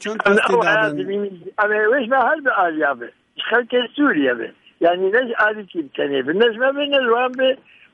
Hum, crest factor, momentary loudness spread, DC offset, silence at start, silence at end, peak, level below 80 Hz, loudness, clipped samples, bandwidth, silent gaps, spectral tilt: none; 16 dB; 11 LU; under 0.1%; 0 s; 0.4 s; -2 dBFS; -66 dBFS; -18 LUFS; under 0.1%; 11 kHz; none; -5 dB/octave